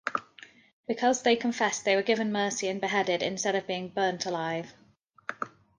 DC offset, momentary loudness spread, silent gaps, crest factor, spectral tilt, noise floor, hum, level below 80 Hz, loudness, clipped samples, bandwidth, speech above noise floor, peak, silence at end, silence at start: under 0.1%; 12 LU; 0.73-0.84 s; 18 dB; -3 dB/octave; -54 dBFS; none; -74 dBFS; -28 LUFS; under 0.1%; 10.5 kHz; 26 dB; -12 dBFS; 0.3 s; 0.05 s